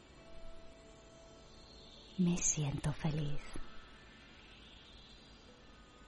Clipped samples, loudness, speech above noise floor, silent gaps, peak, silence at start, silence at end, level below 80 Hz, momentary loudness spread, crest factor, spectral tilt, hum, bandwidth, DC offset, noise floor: under 0.1%; -37 LUFS; 23 dB; none; -20 dBFS; 0 s; 0 s; -54 dBFS; 25 LU; 22 dB; -4.5 dB/octave; none; 11.5 kHz; under 0.1%; -59 dBFS